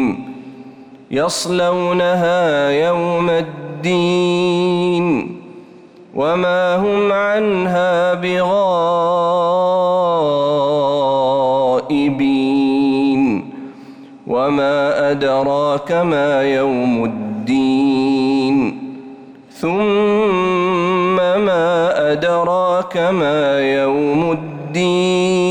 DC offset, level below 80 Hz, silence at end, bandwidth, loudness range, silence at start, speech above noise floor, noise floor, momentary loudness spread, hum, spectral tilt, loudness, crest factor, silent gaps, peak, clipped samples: under 0.1%; -54 dBFS; 0 s; 12 kHz; 2 LU; 0 s; 26 dB; -41 dBFS; 7 LU; none; -6 dB/octave; -16 LUFS; 8 dB; none; -8 dBFS; under 0.1%